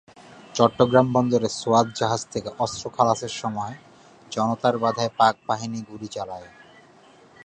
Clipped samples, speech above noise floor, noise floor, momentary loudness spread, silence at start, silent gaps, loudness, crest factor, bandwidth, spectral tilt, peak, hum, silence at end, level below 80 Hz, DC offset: under 0.1%; 29 dB; -52 dBFS; 15 LU; 0.35 s; none; -23 LUFS; 22 dB; 9.4 kHz; -5 dB/octave; -2 dBFS; none; 1 s; -60 dBFS; under 0.1%